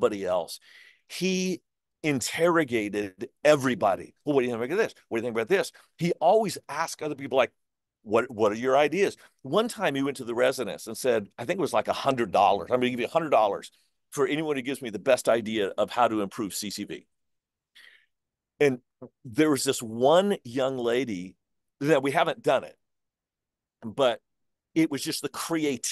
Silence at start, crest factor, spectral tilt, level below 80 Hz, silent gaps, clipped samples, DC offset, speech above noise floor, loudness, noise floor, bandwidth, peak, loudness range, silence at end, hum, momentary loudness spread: 0 s; 20 dB; -4.5 dB/octave; -70 dBFS; none; under 0.1%; under 0.1%; 63 dB; -26 LUFS; -89 dBFS; 12.5 kHz; -6 dBFS; 4 LU; 0 s; none; 11 LU